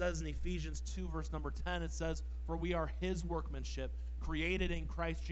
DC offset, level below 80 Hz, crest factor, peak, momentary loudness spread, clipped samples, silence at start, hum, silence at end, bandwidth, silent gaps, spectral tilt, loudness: under 0.1%; -42 dBFS; 16 dB; -22 dBFS; 6 LU; under 0.1%; 0 s; none; 0 s; 8.2 kHz; none; -5.5 dB/octave; -41 LUFS